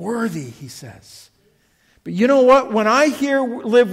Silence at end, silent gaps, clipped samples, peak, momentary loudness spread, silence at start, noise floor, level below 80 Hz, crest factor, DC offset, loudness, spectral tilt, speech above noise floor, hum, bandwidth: 0 s; none; under 0.1%; -2 dBFS; 23 LU; 0 s; -59 dBFS; -58 dBFS; 16 dB; under 0.1%; -16 LUFS; -5 dB/octave; 42 dB; none; 15.5 kHz